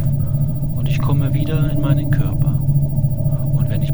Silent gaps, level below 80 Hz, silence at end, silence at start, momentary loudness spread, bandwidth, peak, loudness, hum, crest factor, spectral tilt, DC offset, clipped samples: none; -28 dBFS; 0 s; 0 s; 3 LU; over 20 kHz; -2 dBFS; -18 LUFS; none; 14 dB; -9 dB/octave; 5%; under 0.1%